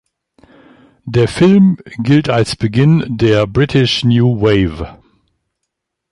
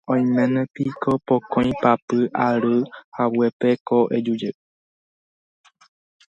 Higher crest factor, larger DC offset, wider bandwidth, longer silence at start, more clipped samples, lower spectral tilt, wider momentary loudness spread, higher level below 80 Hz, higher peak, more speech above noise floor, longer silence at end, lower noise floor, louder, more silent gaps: second, 14 dB vs 20 dB; neither; first, 11.5 kHz vs 7.2 kHz; first, 1.05 s vs 0.1 s; neither; about the same, -7 dB/octave vs -8 dB/octave; first, 9 LU vs 6 LU; first, -38 dBFS vs -56 dBFS; about the same, 0 dBFS vs -2 dBFS; second, 63 dB vs over 70 dB; second, 1.2 s vs 1.8 s; second, -75 dBFS vs under -90 dBFS; first, -13 LUFS vs -21 LUFS; second, none vs 2.02-2.08 s, 3.04-3.12 s, 3.53-3.60 s, 3.80-3.86 s